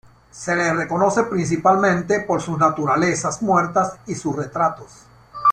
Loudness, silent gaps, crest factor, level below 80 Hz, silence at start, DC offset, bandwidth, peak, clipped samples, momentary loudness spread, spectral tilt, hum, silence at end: -20 LUFS; none; 16 dB; -54 dBFS; 0.35 s; under 0.1%; 10.5 kHz; -4 dBFS; under 0.1%; 8 LU; -5.5 dB/octave; none; 0 s